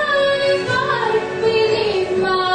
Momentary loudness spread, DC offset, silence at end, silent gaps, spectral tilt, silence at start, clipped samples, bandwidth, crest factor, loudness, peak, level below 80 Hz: 3 LU; under 0.1%; 0 s; none; -4.5 dB/octave; 0 s; under 0.1%; 9.8 kHz; 12 dB; -17 LUFS; -6 dBFS; -52 dBFS